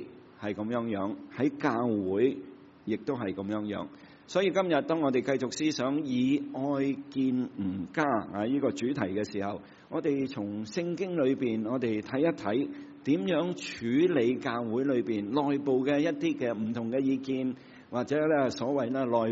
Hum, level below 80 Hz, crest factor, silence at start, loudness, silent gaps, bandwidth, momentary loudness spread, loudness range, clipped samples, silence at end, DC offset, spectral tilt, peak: none; -72 dBFS; 18 dB; 0 s; -30 LUFS; none; 7.6 kHz; 9 LU; 3 LU; under 0.1%; 0 s; under 0.1%; -5.5 dB/octave; -12 dBFS